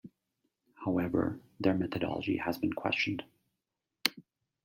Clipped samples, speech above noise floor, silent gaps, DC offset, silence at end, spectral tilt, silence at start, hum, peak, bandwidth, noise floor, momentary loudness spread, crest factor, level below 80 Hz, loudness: under 0.1%; 55 dB; none; under 0.1%; 0.45 s; -5.5 dB/octave; 0.05 s; none; -6 dBFS; 16.5 kHz; -88 dBFS; 4 LU; 28 dB; -66 dBFS; -33 LUFS